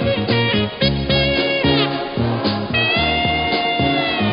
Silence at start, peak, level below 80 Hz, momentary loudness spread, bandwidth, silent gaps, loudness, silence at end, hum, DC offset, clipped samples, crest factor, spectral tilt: 0 s; -4 dBFS; -34 dBFS; 4 LU; 5.4 kHz; none; -17 LUFS; 0 s; none; under 0.1%; under 0.1%; 14 dB; -10.5 dB/octave